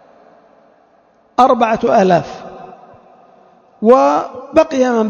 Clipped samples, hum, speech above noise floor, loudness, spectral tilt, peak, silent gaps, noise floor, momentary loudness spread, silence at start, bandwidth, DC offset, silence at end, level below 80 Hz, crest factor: 0.2%; none; 40 dB; -13 LUFS; -6 dB/octave; 0 dBFS; none; -52 dBFS; 20 LU; 1.4 s; 7.8 kHz; under 0.1%; 0 s; -52 dBFS; 16 dB